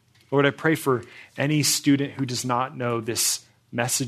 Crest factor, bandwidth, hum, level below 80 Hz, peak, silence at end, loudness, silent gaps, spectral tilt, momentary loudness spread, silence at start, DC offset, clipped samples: 20 dB; 14 kHz; none; -68 dBFS; -6 dBFS; 0 s; -23 LUFS; none; -3.5 dB/octave; 8 LU; 0.3 s; under 0.1%; under 0.1%